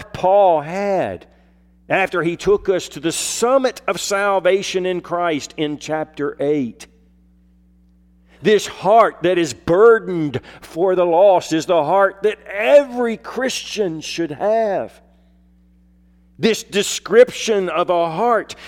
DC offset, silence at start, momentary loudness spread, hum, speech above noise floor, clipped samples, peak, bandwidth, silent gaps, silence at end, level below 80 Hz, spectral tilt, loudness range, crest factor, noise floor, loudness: under 0.1%; 0 s; 10 LU; none; 35 dB; under 0.1%; -2 dBFS; 16.5 kHz; none; 0 s; -52 dBFS; -4 dB/octave; 7 LU; 16 dB; -52 dBFS; -17 LUFS